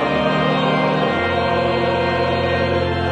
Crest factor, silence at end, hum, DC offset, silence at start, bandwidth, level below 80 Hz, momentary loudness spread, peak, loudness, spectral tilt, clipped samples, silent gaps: 12 dB; 0 s; none; under 0.1%; 0 s; 10 kHz; -40 dBFS; 1 LU; -4 dBFS; -18 LUFS; -7 dB/octave; under 0.1%; none